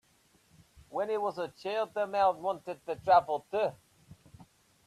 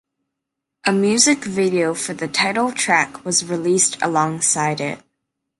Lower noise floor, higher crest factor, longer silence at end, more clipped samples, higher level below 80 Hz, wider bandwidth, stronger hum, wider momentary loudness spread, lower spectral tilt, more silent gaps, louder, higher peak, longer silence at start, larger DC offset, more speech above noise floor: second, -67 dBFS vs -81 dBFS; about the same, 22 dB vs 18 dB; second, 0.45 s vs 0.6 s; neither; second, -70 dBFS vs -64 dBFS; first, 13.5 kHz vs 11.5 kHz; neither; first, 12 LU vs 8 LU; first, -5 dB/octave vs -3 dB/octave; neither; second, -31 LUFS vs -18 LUFS; second, -12 dBFS vs -2 dBFS; about the same, 0.9 s vs 0.85 s; neither; second, 37 dB vs 62 dB